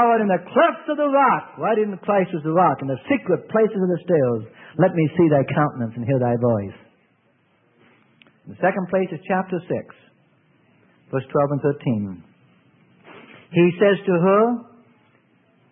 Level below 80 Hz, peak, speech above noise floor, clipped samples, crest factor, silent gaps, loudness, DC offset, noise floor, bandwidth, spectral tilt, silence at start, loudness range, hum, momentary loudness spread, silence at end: -64 dBFS; -4 dBFS; 42 dB; under 0.1%; 18 dB; none; -20 LUFS; under 0.1%; -62 dBFS; 3.8 kHz; -12 dB/octave; 0 s; 7 LU; none; 9 LU; 1.1 s